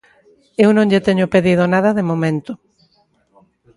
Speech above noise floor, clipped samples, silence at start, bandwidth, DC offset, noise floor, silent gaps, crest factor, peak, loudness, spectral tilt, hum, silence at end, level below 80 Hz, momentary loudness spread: 45 dB; under 0.1%; 0.6 s; 11.5 kHz; under 0.1%; -59 dBFS; none; 16 dB; 0 dBFS; -15 LUFS; -7.5 dB/octave; none; 1.2 s; -52 dBFS; 14 LU